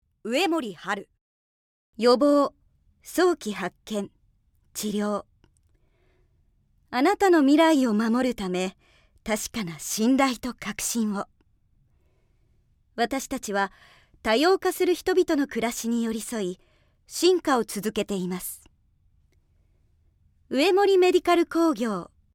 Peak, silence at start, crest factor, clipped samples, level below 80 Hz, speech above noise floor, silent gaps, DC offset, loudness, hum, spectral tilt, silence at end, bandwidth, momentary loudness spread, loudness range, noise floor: -8 dBFS; 0.25 s; 18 dB; under 0.1%; -58 dBFS; 41 dB; 1.21-1.93 s; under 0.1%; -24 LUFS; none; -4 dB/octave; 0.3 s; 17.5 kHz; 13 LU; 8 LU; -65 dBFS